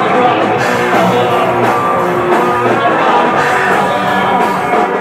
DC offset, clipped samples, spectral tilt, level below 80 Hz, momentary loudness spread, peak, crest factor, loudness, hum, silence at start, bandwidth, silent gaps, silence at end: under 0.1%; under 0.1%; -5.5 dB/octave; -50 dBFS; 2 LU; 0 dBFS; 12 dB; -11 LUFS; none; 0 s; 16.5 kHz; none; 0 s